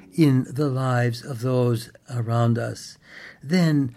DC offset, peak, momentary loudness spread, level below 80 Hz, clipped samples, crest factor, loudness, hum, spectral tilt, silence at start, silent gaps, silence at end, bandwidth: under 0.1%; -6 dBFS; 19 LU; -64 dBFS; under 0.1%; 16 dB; -23 LUFS; none; -7.5 dB/octave; 0.15 s; none; 0.05 s; 14 kHz